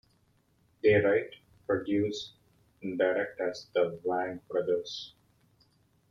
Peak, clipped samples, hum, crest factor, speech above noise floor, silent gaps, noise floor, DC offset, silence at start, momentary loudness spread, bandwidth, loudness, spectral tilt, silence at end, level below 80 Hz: -14 dBFS; under 0.1%; none; 18 dB; 40 dB; none; -69 dBFS; under 0.1%; 0.85 s; 17 LU; 7.4 kHz; -30 LUFS; -6 dB/octave; 1 s; -68 dBFS